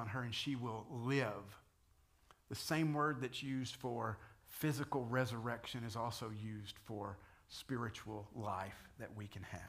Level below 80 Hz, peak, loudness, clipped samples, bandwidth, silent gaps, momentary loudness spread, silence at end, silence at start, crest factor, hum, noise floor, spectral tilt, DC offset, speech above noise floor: -70 dBFS; -22 dBFS; -43 LUFS; under 0.1%; 15.5 kHz; none; 13 LU; 0 s; 0 s; 22 dB; none; -72 dBFS; -5.5 dB/octave; under 0.1%; 30 dB